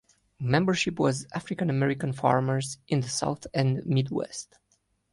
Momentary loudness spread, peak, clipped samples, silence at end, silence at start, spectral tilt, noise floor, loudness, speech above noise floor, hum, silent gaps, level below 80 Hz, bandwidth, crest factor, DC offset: 10 LU; -8 dBFS; under 0.1%; 0.7 s; 0.4 s; -5.5 dB/octave; -71 dBFS; -27 LUFS; 44 dB; none; none; -60 dBFS; 11.5 kHz; 20 dB; under 0.1%